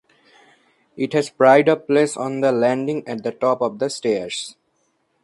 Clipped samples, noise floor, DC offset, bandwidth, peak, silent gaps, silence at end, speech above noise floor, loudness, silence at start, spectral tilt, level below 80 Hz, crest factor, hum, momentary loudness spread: under 0.1%; -67 dBFS; under 0.1%; 11.5 kHz; -2 dBFS; none; 0.75 s; 49 dB; -19 LUFS; 0.95 s; -5 dB/octave; -68 dBFS; 18 dB; none; 14 LU